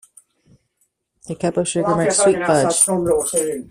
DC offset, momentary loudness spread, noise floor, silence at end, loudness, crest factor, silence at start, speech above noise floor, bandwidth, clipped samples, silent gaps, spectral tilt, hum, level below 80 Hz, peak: under 0.1%; 7 LU; -68 dBFS; 0.1 s; -17 LUFS; 18 dB; 1.25 s; 50 dB; 16 kHz; under 0.1%; none; -4 dB/octave; none; -52 dBFS; -2 dBFS